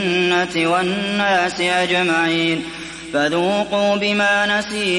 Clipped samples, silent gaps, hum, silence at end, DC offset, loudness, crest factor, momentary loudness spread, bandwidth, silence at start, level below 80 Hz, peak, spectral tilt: under 0.1%; none; none; 0 s; under 0.1%; -17 LUFS; 14 dB; 5 LU; 11.5 kHz; 0 s; -52 dBFS; -4 dBFS; -4 dB/octave